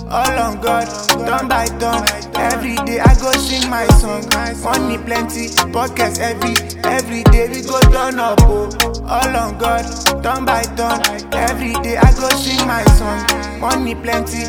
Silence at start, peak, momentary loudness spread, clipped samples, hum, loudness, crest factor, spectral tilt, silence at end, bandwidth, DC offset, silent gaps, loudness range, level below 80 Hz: 0 s; 0 dBFS; 6 LU; under 0.1%; none; -15 LUFS; 14 dB; -4.5 dB/octave; 0 s; 19 kHz; under 0.1%; none; 2 LU; -20 dBFS